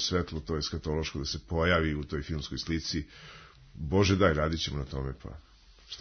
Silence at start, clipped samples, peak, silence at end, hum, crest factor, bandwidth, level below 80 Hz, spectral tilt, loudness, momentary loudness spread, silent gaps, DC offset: 0 s; under 0.1%; -10 dBFS; 0 s; none; 20 dB; 6.6 kHz; -42 dBFS; -5 dB/octave; -30 LUFS; 20 LU; none; under 0.1%